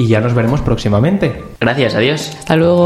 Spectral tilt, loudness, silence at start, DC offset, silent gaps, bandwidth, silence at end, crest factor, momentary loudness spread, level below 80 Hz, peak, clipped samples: -6.5 dB/octave; -14 LUFS; 0 s; under 0.1%; none; 13.5 kHz; 0 s; 12 dB; 5 LU; -32 dBFS; 0 dBFS; under 0.1%